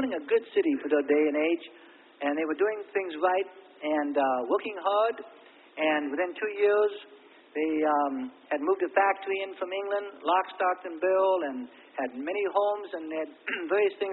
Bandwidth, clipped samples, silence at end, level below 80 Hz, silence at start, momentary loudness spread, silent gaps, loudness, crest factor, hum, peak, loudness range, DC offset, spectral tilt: 4.2 kHz; under 0.1%; 0 s; -78 dBFS; 0 s; 10 LU; none; -28 LUFS; 18 dB; none; -10 dBFS; 2 LU; under 0.1%; -7.5 dB/octave